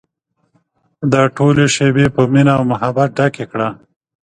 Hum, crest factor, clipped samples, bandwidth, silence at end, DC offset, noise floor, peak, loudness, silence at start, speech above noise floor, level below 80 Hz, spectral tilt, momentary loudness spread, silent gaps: none; 14 dB; under 0.1%; 10 kHz; 0.5 s; under 0.1%; -66 dBFS; 0 dBFS; -14 LUFS; 1 s; 53 dB; -46 dBFS; -6 dB/octave; 9 LU; none